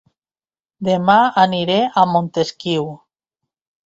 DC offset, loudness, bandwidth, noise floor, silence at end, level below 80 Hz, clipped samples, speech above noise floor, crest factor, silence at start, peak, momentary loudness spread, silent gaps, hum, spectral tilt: under 0.1%; -16 LUFS; 7.8 kHz; under -90 dBFS; 0.9 s; -60 dBFS; under 0.1%; over 74 dB; 18 dB; 0.8 s; 0 dBFS; 9 LU; none; none; -6 dB/octave